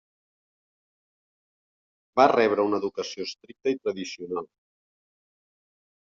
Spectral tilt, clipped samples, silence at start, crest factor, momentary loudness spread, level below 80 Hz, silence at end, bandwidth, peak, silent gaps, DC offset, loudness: -3 dB/octave; under 0.1%; 2.15 s; 26 dB; 15 LU; -74 dBFS; 1.65 s; 7.4 kHz; -4 dBFS; none; under 0.1%; -26 LUFS